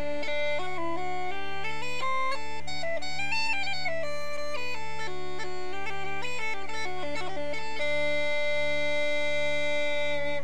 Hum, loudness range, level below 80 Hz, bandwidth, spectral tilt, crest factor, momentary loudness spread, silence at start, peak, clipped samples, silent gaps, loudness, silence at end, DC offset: none; 5 LU; -56 dBFS; 15 kHz; -3.5 dB/octave; 14 dB; 7 LU; 0 s; -18 dBFS; under 0.1%; none; -31 LUFS; 0 s; 5%